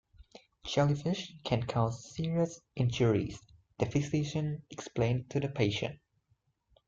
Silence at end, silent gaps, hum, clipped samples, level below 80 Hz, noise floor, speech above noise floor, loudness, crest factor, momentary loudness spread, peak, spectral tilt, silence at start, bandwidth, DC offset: 0.95 s; none; none; under 0.1%; -58 dBFS; -75 dBFS; 43 dB; -33 LUFS; 18 dB; 10 LU; -14 dBFS; -6.5 dB/octave; 0.2 s; 7.6 kHz; under 0.1%